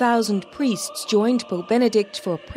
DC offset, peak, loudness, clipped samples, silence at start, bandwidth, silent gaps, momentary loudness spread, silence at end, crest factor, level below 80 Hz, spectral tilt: under 0.1%; -8 dBFS; -22 LUFS; under 0.1%; 0 s; 16 kHz; none; 7 LU; 0 s; 14 dB; -54 dBFS; -4.5 dB/octave